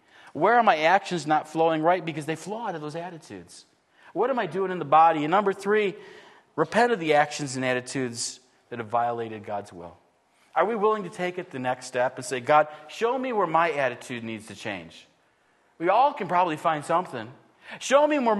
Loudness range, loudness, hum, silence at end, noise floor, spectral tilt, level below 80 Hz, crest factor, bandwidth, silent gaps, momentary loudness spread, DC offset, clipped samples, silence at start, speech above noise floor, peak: 5 LU; -25 LUFS; none; 0 s; -65 dBFS; -4.5 dB/octave; -76 dBFS; 20 dB; 12.5 kHz; none; 16 LU; under 0.1%; under 0.1%; 0.25 s; 40 dB; -4 dBFS